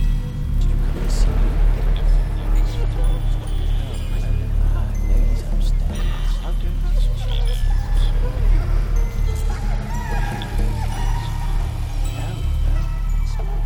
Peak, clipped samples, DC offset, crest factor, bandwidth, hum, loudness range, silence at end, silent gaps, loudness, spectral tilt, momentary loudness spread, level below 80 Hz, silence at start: -6 dBFS; under 0.1%; under 0.1%; 12 dB; 11 kHz; none; 2 LU; 0 s; none; -24 LUFS; -6 dB/octave; 4 LU; -18 dBFS; 0 s